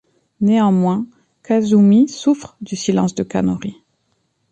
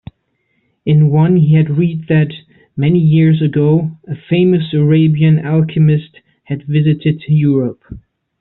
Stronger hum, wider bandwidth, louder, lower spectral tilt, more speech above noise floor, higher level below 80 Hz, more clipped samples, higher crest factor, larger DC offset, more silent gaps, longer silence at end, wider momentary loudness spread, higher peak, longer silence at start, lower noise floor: neither; first, 8.8 kHz vs 4.1 kHz; second, -16 LUFS vs -13 LUFS; second, -7 dB/octave vs -8.5 dB/octave; about the same, 51 dB vs 52 dB; second, -54 dBFS vs -48 dBFS; neither; about the same, 14 dB vs 10 dB; neither; neither; first, 0.8 s vs 0.4 s; about the same, 13 LU vs 12 LU; about the same, -4 dBFS vs -2 dBFS; second, 0.4 s vs 0.85 s; about the same, -66 dBFS vs -64 dBFS